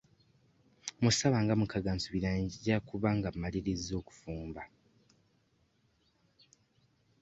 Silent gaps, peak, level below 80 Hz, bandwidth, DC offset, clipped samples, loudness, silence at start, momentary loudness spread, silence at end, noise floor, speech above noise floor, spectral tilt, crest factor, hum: none; -16 dBFS; -54 dBFS; 8.2 kHz; under 0.1%; under 0.1%; -33 LUFS; 0.85 s; 16 LU; 2.55 s; -73 dBFS; 40 dB; -5 dB/octave; 20 dB; none